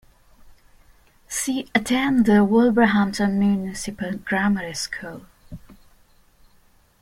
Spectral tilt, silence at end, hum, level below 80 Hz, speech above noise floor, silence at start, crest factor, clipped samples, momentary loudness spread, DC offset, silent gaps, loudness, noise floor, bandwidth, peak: -5 dB/octave; 1.3 s; none; -50 dBFS; 36 dB; 0.45 s; 18 dB; under 0.1%; 13 LU; under 0.1%; none; -21 LUFS; -57 dBFS; 15.5 kHz; -4 dBFS